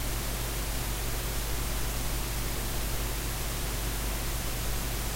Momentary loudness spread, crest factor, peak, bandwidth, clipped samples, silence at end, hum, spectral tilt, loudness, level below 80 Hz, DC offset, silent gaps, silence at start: 0 LU; 12 dB; -18 dBFS; 16 kHz; under 0.1%; 0 s; none; -3.5 dB/octave; -32 LUFS; -34 dBFS; under 0.1%; none; 0 s